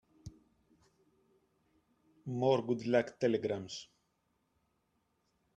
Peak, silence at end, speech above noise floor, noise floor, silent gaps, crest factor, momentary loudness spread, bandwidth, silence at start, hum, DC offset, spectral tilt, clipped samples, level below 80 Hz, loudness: -16 dBFS; 1.7 s; 46 dB; -79 dBFS; none; 22 dB; 15 LU; 8.8 kHz; 0.25 s; none; under 0.1%; -6 dB/octave; under 0.1%; -74 dBFS; -34 LUFS